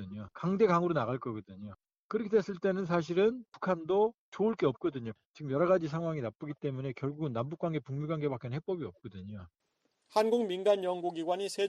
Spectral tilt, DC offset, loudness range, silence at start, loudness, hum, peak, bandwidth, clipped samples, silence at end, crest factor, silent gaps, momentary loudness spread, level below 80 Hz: -7 dB/octave; under 0.1%; 5 LU; 0 s; -32 LUFS; none; -16 dBFS; 12 kHz; under 0.1%; 0 s; 18 dB; 1.98-2.10 s, 4.14-4.32 s, 5.26-5.31 s; 15 LU; -70 dBFS